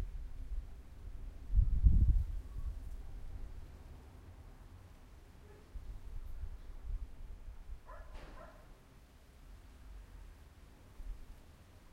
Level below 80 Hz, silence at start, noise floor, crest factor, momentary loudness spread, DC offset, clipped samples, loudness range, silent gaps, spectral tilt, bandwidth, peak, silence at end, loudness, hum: -40 dBFS; 0 s; -59 dBFS; 24 dB; 25 LU; under 0.1%; under 0.1%; 19 LU; none; -8 dB/octave; 6.2 kHz; -14 dBFS; 0.05 s; -40 LUFS; none